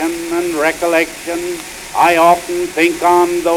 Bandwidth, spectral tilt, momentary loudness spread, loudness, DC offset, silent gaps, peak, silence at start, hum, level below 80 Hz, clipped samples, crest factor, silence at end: 16 kHz; -3.5 dB/octave; 11 LU; -14 LUFS; under 0.1%; none; -2 dBFS; 0 s; none; -48 dBFS; under 0.1%; 14 dB; 0 s